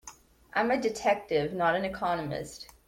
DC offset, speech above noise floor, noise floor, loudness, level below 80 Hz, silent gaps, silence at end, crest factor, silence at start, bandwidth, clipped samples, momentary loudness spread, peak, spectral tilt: under 0.1%; 23 dB; -52 dBFS; -29 LUFS; -58 dBFS; none; 0.2 s; 18 dB; 0.05 s; 16.5 kHz; under 0.1%; 10 LU; -12 dBFS; -5 dB/octave